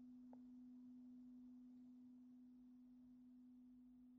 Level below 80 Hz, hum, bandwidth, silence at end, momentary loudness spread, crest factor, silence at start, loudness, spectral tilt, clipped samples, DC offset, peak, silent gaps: -90 dBFS; none; 3.6 kHz; 0 s; 4 LU; 12 dB; 0 s; -64 LUFS; -8 dB/octave; under 0.1%; under 0.1%; -50 dBFS; none